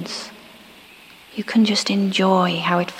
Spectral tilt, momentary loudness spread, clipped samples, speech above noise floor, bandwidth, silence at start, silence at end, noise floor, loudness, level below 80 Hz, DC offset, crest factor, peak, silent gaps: -5 dB/octave; 15 LU; under 0.1%; 27 dB; 15.5 kHz; 0 s; 0 s; -45 dBFS; -19 LUFS; -66 dBFS; under 0.1%; 18 dB; -4 dBFS; none